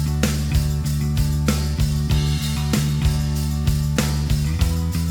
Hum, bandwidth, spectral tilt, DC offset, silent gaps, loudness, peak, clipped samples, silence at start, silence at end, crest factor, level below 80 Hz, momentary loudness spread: none; over 20 kHz; -5.5 dB/octave; under 0.1%; none; -21 LUFS; -4 dBFS; under 0.1%; 0 s; 0 s; 16 dB; -26 dBFS; 2 LU